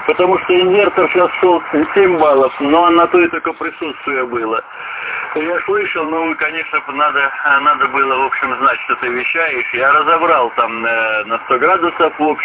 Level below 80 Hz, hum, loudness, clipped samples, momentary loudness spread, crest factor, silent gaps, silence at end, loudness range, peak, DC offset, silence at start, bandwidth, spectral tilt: -54 dBFS; none; -14 LUFS; under 0.1%; 8 LU; 14 dB; none; 0 s; 5 LU; 0 dBFS; under 0.1%; 0 s; 4 kHz; -8 dB/octave